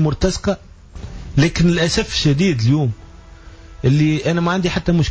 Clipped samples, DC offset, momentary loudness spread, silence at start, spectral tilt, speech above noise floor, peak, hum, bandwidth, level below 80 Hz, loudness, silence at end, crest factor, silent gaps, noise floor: under 0.1%; under 0.1%; 12 LU; 0 s; -6 dB/octave; 23 dB; -4 dBFS; none; 8 kHz; -32 dBFS; -17 LUFS; 0 s; 14 dB; none; -39 dBFS